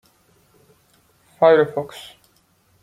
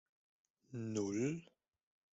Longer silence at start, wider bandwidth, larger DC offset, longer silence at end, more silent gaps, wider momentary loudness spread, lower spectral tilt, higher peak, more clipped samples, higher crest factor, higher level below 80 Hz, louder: first, 1.4 s vs 0.7 s; first, 13.5 kHz vs 8 kHz; neither; about the same, 0.8 s vs 0.7 s; neither; first, 25 LU vs 11 LU; about the same, -6 dB/octave vs -6 dB/octave; first, -2 dBFS vs -26 dBFS; neither; about the same, 20 dB vs 18 dB; first, -68 dBFS vs -78 dBFS; first, -17 LUFS vs -41 LUFS